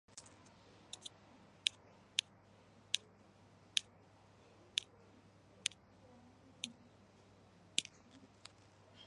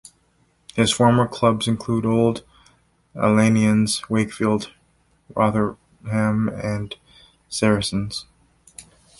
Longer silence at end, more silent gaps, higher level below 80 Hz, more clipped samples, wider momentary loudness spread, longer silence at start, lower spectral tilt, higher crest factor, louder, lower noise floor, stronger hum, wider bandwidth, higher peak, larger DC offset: second, 0 s vs 0.4 s; neither; second, -80 dBFS vs -50 dBFS; neither; first, 25 LU vs 16 LU; second, 0.15 s vs 0.75 s; second, 0 dB/octave vs -5.5 dB/octave; first, 38 dB vs 18 dB; second, -42 LUFS vs -21 LUFS; about the same, -65 dBFS vs -62 dBFS; neither; about the same, 11.5 kHz vs 11.5 kHz; second, -10 dBFS vs -4 dBFS; neither